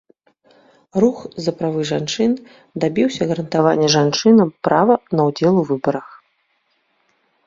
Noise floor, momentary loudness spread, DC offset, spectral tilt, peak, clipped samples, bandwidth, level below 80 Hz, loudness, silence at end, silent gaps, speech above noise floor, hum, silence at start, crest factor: -65 dBFS; 10 LU; under 0.1%; -5.5 dB/octave; -2 dBFS; under 0.1%; 7.6 kHz; -58 dBFS; -17 LUFS; 1.4 s; none; 49 dB; none; 0.95 s; 18 dB